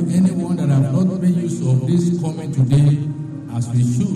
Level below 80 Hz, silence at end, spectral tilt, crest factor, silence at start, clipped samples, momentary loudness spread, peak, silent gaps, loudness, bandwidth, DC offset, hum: -48 dBFS; 0 s; -8.5 dB/octave; 10 dB; 0 s; under 0.1%; 8 LU; -8 dBFS; none; -18 LUFS; 10.5 kHz; under 0.1%; none